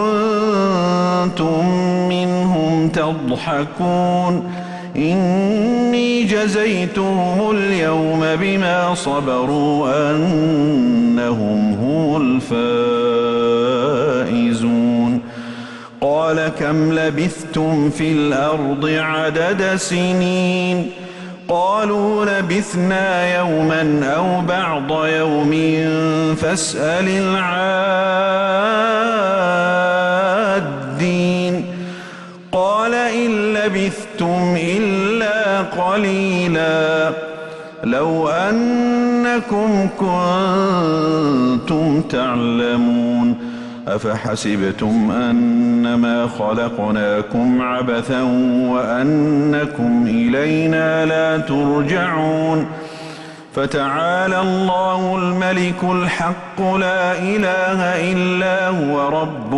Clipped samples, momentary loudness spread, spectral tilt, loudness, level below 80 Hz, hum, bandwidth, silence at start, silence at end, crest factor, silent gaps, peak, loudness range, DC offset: under 0.1%; 5 LU; -6 dB/octave; -17 LUFS; -50 dBFS; none; 11.5 kHz; 0 s; 0 s; 10 dB; none; -6 dBFS; 2 LU; under 0.1%